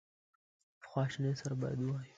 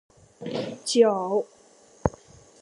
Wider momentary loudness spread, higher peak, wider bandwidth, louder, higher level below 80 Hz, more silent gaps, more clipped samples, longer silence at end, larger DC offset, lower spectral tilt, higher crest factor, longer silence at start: second, 3 LU vs 15 LU; second, -20 dBFS vs -2 dBFS; second, 7.8 kHz vs 11.5 kHz; second, -38 LUFS vs -25 LUFS; second, -70 dBFS vs -50 dBFS; neither; neither; second, 0.1 s vs 0.55 s; neither; first, -7 dB/octave vs -4.5 dB/octave; second, 18 dB vs 24 dB; first, 0.8 s vs 0.4 s